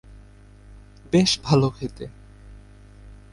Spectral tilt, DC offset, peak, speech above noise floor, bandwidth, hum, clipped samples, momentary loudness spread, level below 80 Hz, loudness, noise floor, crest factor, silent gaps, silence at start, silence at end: -5.5 dB/octave; under 0.1%; -6 dBFS; 27 dB; 11.5 kHz; 50 Hz at -45 dBFS; under 0.1%; 19 LU; -46 dBFS; -21 LUFS; -47 dBFS; 20 dB; none; 0.1 s; 0.2 s